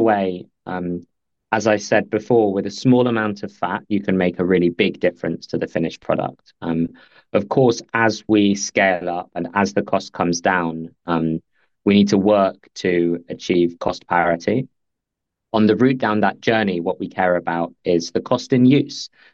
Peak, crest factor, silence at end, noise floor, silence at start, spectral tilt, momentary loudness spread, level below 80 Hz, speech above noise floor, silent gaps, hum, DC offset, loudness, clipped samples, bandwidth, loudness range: -2 dBFS; 18 dB; 0.25 s; -81 dBFS; 0 s; -6 dB/octave; 11 LU; -56 dBFS; 62 dB; none; none; under 0.1%; -19 LUFS; under 0.1%; 7.6 kHz; 2 LU